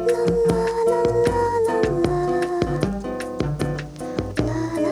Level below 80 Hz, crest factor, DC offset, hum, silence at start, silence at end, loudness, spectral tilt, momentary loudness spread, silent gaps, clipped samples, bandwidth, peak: -38 dBFS; 20 dB; under 0.1%; none; 0 s; 0 s; -22 LUFS; -7 dB/octave; 8 LU; none; under 0.1%; 13 kHz; -2 dBFS